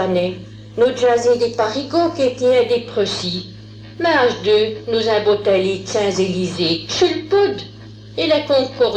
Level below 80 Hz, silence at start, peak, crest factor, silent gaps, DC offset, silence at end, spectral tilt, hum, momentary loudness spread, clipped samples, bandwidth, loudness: -50 dBFS; 0 s; -4 dBFS; 14 dB; none; under 0.1%; 0 s; -4.5 dB/octave; none; 11 LU; under 0.1%; 9.4 kHz; -17 LUFS